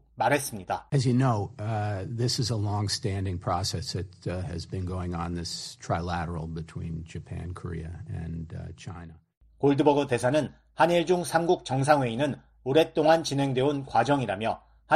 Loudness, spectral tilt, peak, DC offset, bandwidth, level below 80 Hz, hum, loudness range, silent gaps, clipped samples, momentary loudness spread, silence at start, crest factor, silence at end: -28 LUFS; -5.5 dB/octave; -8 dBFS; under 0.1%; 13 kHz; -52 dBFS; none; 10 LU; 9.37-9.41 s; under 0.1%; 14 LU; 0.15 s; 20 dB; 0 s